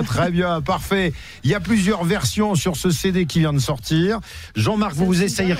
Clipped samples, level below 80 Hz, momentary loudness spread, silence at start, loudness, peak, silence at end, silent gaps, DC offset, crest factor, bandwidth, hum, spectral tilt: under 0.1%; -38 dBFS; 4 LU; 0 s; -20 LUFS; -8 dBFS; 0 s; none; under 0.1%; 12 dB; 16 kHz; none; -5.5 dB/octave